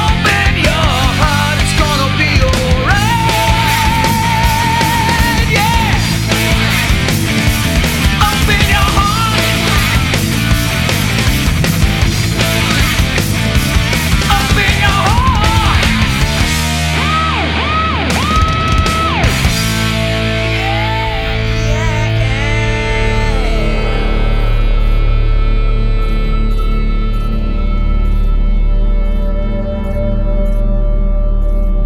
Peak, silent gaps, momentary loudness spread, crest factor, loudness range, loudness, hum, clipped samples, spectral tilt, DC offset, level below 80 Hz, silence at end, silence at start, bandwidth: 0 dBFS; none; 6 LU; 12 dB; 6 LU; -13 LUFS; none; under 0.1%; -4.5 dB/octave; under 0.1%; -16 dBFS; 0 s; 0 s; 17 kHz